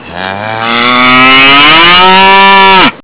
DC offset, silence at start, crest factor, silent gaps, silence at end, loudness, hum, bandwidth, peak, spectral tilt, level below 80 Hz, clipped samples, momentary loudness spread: 7%; 0 s; 4 dB; none; 0 s; -1 LUFS; none; 4 kHz; 0 dBFS; -7 dB/octave; -36 dBFS; 10%; 13 LU